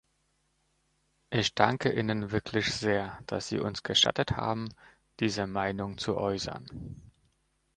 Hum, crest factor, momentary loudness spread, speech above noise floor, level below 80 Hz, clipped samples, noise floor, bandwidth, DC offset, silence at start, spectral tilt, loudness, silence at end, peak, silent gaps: none; 28 dB; 14 LU; 44 dB; -56 dBFS; under 0.1%; -74 dBFS; 10.5 kHz; under 0.1%; 1.3 s; -4 dB/octave; -30 LUFS; 0.7 s; -4 dBFS; none